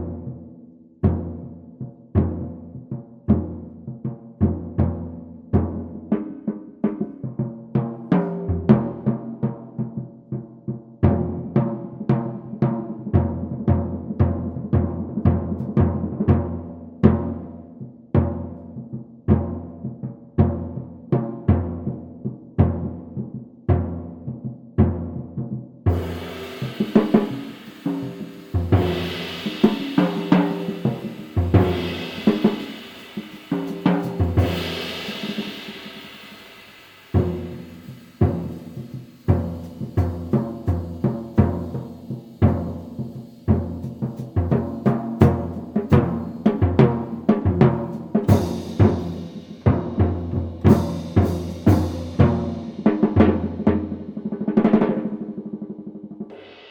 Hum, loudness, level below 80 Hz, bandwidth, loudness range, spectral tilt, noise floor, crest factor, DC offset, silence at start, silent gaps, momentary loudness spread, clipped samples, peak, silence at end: none; -23 LUFS; -38 dBFS; 17 kHz; 6 LU; -8.5 dB/octave; -46 dBFS; 22 dB; under 0.1%; 0 s; none; 16 LU; under 0.1%; 0 dBFS; 0 s